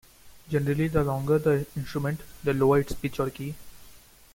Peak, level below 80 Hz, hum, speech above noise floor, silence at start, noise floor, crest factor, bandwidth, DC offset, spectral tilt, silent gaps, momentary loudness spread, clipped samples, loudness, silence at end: -10 dBFS; -46 dBFS; none; 26 dB; 0.25 s; -52 dBFS; 18 dB; 17 kHz; under 0.1%; -7.5 dB/octave; none; 10 LU; under 0.1%; -27 LUFS; 0.35 s